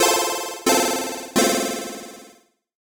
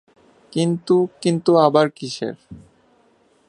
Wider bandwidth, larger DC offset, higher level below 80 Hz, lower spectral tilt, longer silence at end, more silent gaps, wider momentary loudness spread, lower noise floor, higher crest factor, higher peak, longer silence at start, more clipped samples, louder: first, 19.5 kHz vs 10.5 kHz; neither; about the same, -60 dBFS vs -62 dBFS; second, -1.5 dB/octave vs -6.5 dB/octave; second, 0.6 s vs 0.9 s; neither; about the same, 15 LU vs 14 LU; second, -53 dBFS vs -58 dBFS; about the same, 18 dB vs 20 dB; second, -4 dBFS vs 0 dBFS; second, 0 s vs 0.55 s; neither; about the same, -21 LUFS vs -19 LUFS